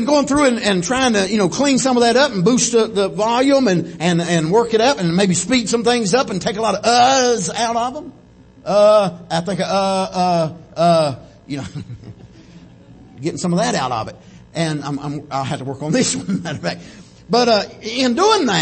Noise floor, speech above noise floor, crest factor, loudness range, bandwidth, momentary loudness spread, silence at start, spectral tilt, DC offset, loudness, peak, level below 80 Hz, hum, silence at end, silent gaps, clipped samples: -44 dBFS; 28 dB; 16 dB; 7 LU; 8.8 kHz; 12 LU; 0 s; -4 dB/octave; under 0.1%; -17 LUFS; -2 dBFS; -50 dBFS; none; 0 s; none; under 0.1%